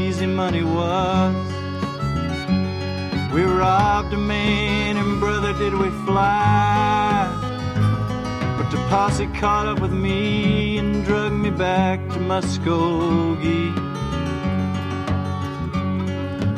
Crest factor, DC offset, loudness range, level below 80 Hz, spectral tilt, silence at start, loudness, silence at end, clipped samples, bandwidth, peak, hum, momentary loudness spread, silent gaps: 16 dB; under 0.1%; 3 LU; -36 dBFS; -6.5 dB/octave; 0 s; -21 LUFS; 0 s; under 0.1%; 11.5 kHz; -4 dBFS; none; 7 LU; none